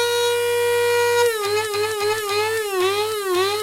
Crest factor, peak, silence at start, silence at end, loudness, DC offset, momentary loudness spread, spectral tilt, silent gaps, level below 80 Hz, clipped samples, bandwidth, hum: 12 dB; -8 dBFS; 0 s; 0 s; -20 LUFS; under 0.1%; 4 LU; -2 dB/octave; none; -60 dBFS; under 0.1%; 17 kHz; none